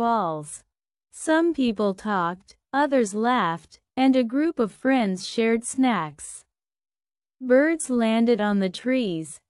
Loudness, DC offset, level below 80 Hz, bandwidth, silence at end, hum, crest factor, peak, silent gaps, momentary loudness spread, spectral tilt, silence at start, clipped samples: -23 LUFS; under 0.1%; -64 dBFS; 12 kHz; 0.15 s; none; 16 dB; -6 dBFS; none; 15 LU; -5 dB/octave; 0 s; under 0.1%